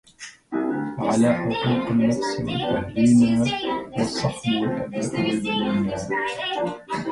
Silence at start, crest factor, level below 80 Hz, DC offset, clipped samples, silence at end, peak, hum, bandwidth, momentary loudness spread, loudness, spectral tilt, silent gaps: 0.2 s; 16 dB; -52 dBFS; under 0.1%; under 0.1%; 0 s; -8 dBFS; none; 11.5 kHz; 9 LU; -23 LUFS; -5.5 dB/octave; none